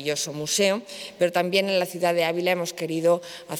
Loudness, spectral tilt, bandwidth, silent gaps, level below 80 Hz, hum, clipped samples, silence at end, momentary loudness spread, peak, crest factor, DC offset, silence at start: -24 LUFS; -3.5 dB/octave; 18.5 kHz; none; -72 dBFS; none; under 0.1%; 0 s; 5 LU; -8 dBFS; 16 dB; under 0.1%; 0 s